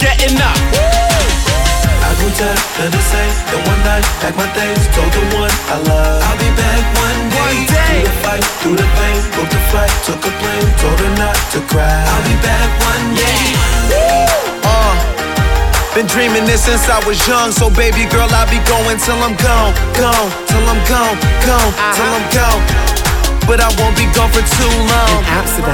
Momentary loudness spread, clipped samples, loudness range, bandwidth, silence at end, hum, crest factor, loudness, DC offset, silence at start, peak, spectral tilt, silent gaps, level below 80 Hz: 3 LU; under 0.1%; 2 LU; 18.5 kHz; 0 s; none; 10 dB; -12 LUFS; under 0.1%; 0 s; -2 dBFS; -4 dB/octave; none; -14 dBFS